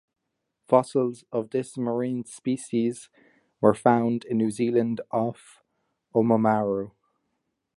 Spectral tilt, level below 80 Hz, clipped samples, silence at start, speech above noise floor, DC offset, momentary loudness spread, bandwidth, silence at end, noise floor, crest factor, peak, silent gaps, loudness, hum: -7 dB/octave; -68 dBFS; under 0.1%; 0.7 s; 55 dB; under 0.1%; 9 LU; 11.5 kHz; 0.9 s; -80 dBFS; 22 dB; -4 dBFS; none; -25 LUFS; none